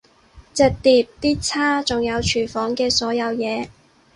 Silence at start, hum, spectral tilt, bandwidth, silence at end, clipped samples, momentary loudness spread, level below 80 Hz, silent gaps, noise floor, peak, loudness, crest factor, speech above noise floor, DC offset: 0.35 s; none; -3.5 dB/octave; 11.5 kHz; 0.45 s; under 0.1%; 8 LU; -42 dBFS; none; -49 dBFS; -4 dBFS; -20 LUFS; 18 dB; 29 dB; under 0.1%